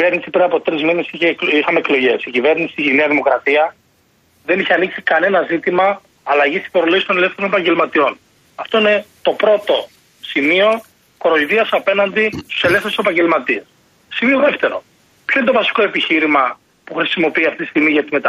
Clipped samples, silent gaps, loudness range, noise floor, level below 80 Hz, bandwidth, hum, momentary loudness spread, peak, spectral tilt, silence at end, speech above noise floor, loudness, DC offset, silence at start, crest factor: under 0.1%; none; 1 LU; -56 dBFS; -60 dBFS; 14 kHz; none; 7 LU; -2 dBFS; -5 dB/octave; 0 s; 41 dB; -15 LUFS; under 0.1%; 0 s; 14 dB